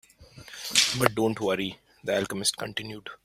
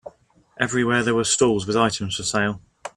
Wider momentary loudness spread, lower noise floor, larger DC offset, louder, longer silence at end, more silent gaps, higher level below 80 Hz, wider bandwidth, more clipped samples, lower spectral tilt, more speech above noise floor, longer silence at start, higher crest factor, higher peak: first, 16 LU vs 7 LU; second, -49 dBFS vs -56 dBFS; neither; second, -26 LUFS vs -21 LUFS; about the same, 0.1 s vs 0.05 s; neither; second, -60 dBFS vs -54 dBFS; first, 16 kHz vs 13 kHz; neither; about the same, -2.5 dB/octave vs -3.5 dB/octave; second, 21 dB vs 35 dB; first, 0.2 s vs 0.05 s; about the same, 26 dB vs 22 dB; about the same, -2 dBFS vs -2 dBFS